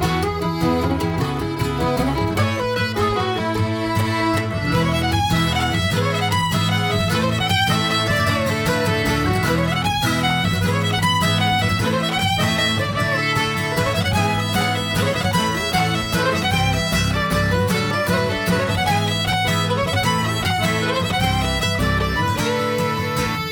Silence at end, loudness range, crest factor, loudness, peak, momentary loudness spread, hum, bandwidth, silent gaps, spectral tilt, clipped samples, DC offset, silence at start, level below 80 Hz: 0 s; 2 LU; 14 dB; -19 LUFS; -6 dBFS; 3 LU; none; 20 kHz; none; -5 dB/octave; under 0.1%; under 0.1%; 0 s; -36 dBFS